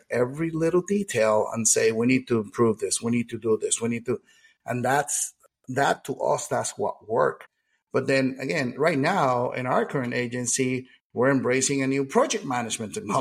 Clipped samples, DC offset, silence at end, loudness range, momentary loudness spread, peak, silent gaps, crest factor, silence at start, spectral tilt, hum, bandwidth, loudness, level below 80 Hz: under 0.1%; under 0.1%; 0 s; 3 LU; 8 LU; -6 dBFS; 7.82-7.87 s, 11.01-11.10 s; 18 dB; 0.1 s; -4 dB/octave; none; 16 kHz; -25 LUFS; -64 dBFS